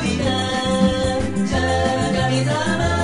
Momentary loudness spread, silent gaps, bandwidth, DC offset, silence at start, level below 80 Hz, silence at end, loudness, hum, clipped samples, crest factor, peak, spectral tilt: 3 LU; none; 11.5 kHz; under 0.1%; 0 s; -32 dBFS; 0 s; -19 LUFS; none; under 0.1%; 14 dB; -6 dBFS; -5 dB/octave